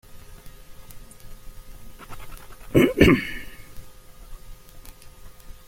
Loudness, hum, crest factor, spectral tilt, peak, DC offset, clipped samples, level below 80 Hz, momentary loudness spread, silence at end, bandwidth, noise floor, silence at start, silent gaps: -19 LUFS; none; 24 dB; -6 dB/octave; -2 dBFS; under 0.1%; under 0.1%; -40 dBFS; 29 LU; 0.1 s; 16.5 kHz; -43 dBFS; 0.1 s; none